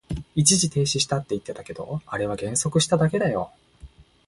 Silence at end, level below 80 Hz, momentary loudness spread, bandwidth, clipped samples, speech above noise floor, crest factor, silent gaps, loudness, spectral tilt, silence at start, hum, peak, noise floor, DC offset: 0.4 s; -48 dBFS; 14 LU; 12 kHz; under 0.1%; 24 dB; 22 dB; none; -23 LUFS; -4 dB/octave; 0.1 s; none; -4 dBFS; -48 dBFS; under 0.1%